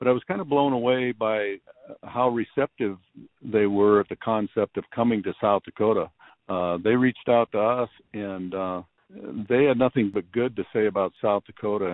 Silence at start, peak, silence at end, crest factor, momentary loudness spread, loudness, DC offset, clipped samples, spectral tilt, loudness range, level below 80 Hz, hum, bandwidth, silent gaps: 0 s; -6 dBFS; 0 s; 18 dB; 13 LU; -25 LUFS; under 0.1%; under 0.1%; -10.5 dB/octave; 2 LU; -64 dBFS; none; 4.1 kHz; none